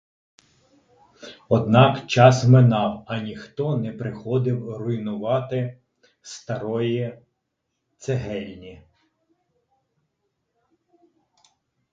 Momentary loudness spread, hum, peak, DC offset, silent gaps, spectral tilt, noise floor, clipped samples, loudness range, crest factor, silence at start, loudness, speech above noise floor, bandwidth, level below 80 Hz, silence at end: 19 LU; none; 0 dBFS; under 0.1%; none; -7 dB/octave; -78 dBFS; under 0.1%; 16 LU; 24 dB; 1.2 s; -21 LUFS; 57 dB; 7.6 kHz; -56 dBFS; 3.2 s